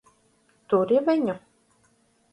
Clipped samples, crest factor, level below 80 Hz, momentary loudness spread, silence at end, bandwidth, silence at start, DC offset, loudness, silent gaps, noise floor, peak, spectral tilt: under 0.1%; 16 dB; -72 dBFS; 10 LU; 0.95 s; 11.5 kHz; 0.7 s; under 0.1%; -23 LUFS; none; -64 dBFS; -10 dBFS; -8 dB/octave